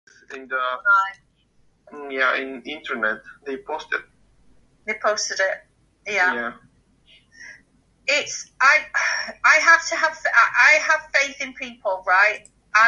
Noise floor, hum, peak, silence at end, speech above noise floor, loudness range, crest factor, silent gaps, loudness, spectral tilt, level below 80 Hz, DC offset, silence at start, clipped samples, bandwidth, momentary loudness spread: -60 dBFS; none; -2 dBFS; 0 s; 39 dB; 10 LU; 20 dB; none; -19 LUFS; 0 dB/octave; -64 dBFS; under 0.1%; 0.3 s; under 0.1%; 11 kHz; 18 LU